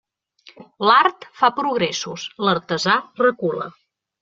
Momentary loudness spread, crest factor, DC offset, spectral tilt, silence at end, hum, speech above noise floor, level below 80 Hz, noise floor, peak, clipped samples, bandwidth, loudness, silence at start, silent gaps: 11 LU; 20 dB; under 0.1%; -4 dB/octave; 0.5 s; none; 32 dB; -66 dBFS; -52 dBFS; -2 dBFS; under 0.1%; 7.8 kHz; -19 LUFS; 0.6 s; none